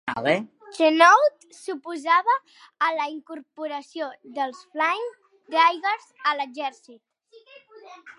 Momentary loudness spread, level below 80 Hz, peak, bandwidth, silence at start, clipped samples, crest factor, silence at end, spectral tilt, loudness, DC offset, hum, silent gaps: 18 LU; -76 dBFS; -2 dBFS; 11.5 kHz; 0.05 s; under 0.1%; 22 dB; 0.05 s; -3.5 dB/octave; -23 LUFS; under 0.1%; none; none